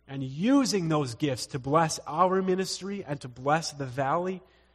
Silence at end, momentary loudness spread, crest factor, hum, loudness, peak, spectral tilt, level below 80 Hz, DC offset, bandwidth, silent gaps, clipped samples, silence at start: 0.35 s; 11 LU; 18 dB; none; -28 LUFS; -10 dBFS; -5 dB/octave; -62 dBFS; under 0.1%; 13.5 kHz; none; under 0.1%; 0.1 s